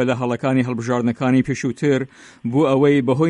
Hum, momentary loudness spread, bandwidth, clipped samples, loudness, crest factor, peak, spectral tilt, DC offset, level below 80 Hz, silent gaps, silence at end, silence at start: none; 7 LU; 10 kHz; under 0.1%; -19 LUFS; 14 dB; -4 dBFS; -7 dB/octave; under 0.1%; -56 dBFS; none; 0 s; 0 s